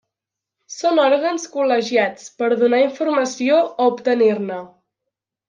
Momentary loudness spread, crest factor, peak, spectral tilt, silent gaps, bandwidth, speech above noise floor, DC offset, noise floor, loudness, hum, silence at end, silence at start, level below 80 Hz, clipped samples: 8 LU; 16 dB; -4 dBFS; -4 dB/octave; none; 9.4 kHz; 67 dB; under 0.1%; -85 dBFS; -18 LUFS; none; 0.8 s; 0.7 s; -74 dBFS; under 0.1%